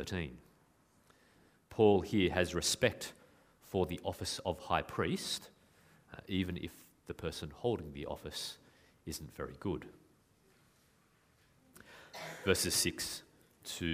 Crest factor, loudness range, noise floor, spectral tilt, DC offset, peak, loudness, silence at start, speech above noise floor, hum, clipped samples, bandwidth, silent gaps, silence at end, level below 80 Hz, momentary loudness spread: 24 dB; 12 LU; -70 dBFS; -4 dB/octave; under 0.1%; -14 dBFS; -36 LUFS; 0 s; 34 dB; none; under 0.1%; 15.5 kHz; none; 0 s; -60 dBFS; 19 LU